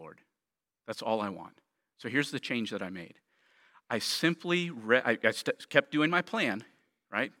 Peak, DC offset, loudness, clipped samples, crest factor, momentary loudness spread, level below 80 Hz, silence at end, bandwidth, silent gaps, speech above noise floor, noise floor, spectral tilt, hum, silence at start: -6 dBFS; under 0.1%; -31 LUFS; under 0.1%; 26 dB; 15 LU; -82 dBFS; 0.1 s; 17 kHz; none; over 59 dB; under -90 dBFS; -4.5 dB/octave; none; 0 s